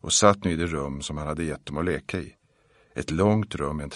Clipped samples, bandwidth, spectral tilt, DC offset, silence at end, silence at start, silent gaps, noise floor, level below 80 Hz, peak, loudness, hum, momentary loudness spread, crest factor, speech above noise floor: under 0.1%; 11.5 kHz; -4.5 dB/octave; under 0.1%; 0 s; 0.05 s; none; -62 dBFS; -44 dBFS; -2 dBFS; -26 LUFS; none; 14 LU; 24 dB; 37 dB